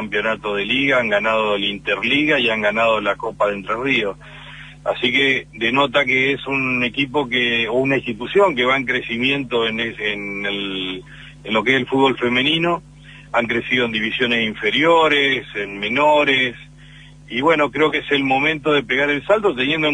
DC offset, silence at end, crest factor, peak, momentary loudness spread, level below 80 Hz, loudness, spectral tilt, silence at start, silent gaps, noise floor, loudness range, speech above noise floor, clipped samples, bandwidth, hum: under 0.1%; 0 s; 18 dB; -2 dBFS; 8 LU; -48 dBFS; -18 LUFS; -5 dB/octave; 0 s; none; -42 dBFS; 3 LU; 24 dB; under 0.1%; 10 kHz; none